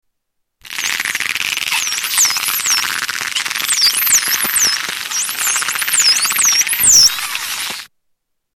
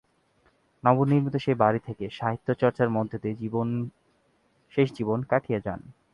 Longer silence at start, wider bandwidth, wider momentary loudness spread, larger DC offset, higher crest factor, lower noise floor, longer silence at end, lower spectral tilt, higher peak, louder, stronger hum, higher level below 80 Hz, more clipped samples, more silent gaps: second, 0.65 s vs 0.85 s; first, 18 kHz vs 7 kHz; about the same, 10 LU vs 10 LU; neither; second, 14 dB vs 22 dB; first, -71 dBFS vs -67 dBFS; first, 0.7 s vs 0.2 s; second, 3 dB/octave vs -9 dB/octave; first, -2 dBFS vs -6 dBFS; first, -13 LUFS vs -26 LUFS; neither; first, -54 dBFS vs -60 dBFS; neither; neither